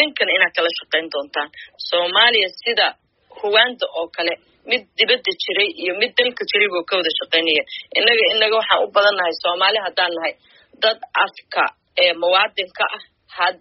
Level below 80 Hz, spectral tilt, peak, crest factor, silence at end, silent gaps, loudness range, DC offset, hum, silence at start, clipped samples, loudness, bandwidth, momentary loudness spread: -70 dBFS; 3 dB/octave; 0 dBFS; 18 dB; 0.05 s; none; 3 LU; under 0.1%; none; 0 s; under 0.1%; -17 LUFS; 6 kHz; 10 LU